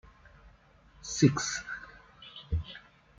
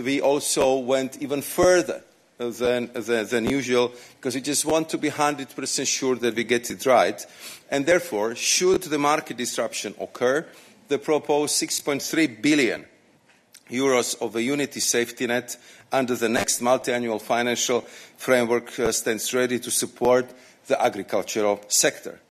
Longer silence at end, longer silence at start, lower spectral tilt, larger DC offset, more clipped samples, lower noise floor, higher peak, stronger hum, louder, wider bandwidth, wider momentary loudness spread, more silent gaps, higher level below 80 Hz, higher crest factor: first, 0.4 s vs 0.2 s; first, 0.45 s vs 0 s; first, -4.5 dB/octave vs -2.5 dB/octave; neither; neither; about the same, -60 dBFS vs -59 dBFS; second, -10 dBFS vs -6 dBFS; neither; second, -31 LUFS vs -23 LUFS; second, 9.4 kHz vs 14 kHz; first, 24 LU vs 9 LU; neither; first, -50 dBFS vs -60 dBFS; first, 24 dB vs 18 dB